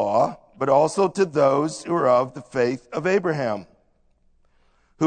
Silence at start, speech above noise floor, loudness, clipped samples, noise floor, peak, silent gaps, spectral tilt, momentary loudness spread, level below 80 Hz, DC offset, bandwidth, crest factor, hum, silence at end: 0 s; 41 dB; -22 LUFS; under 0.1%; -62 dBFS; -6 dBFS; none; -6 dB/octave; 8 LU; -62 dBFS; under 0.1%; 9.4 kHz; 18 dB; none; 0 s